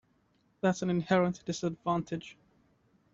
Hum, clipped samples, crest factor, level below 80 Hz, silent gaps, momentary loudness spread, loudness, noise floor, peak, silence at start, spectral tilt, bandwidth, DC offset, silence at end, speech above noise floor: none; under 0.1%; 20 dB; -66 dBFS; none; 12 LU; -32 LUFS; -71 dBFS; -14 dBFS; 0.65 s; -6 dB/octave; 7.8 kHz; under 0.1%; 0.8 s; 40 dB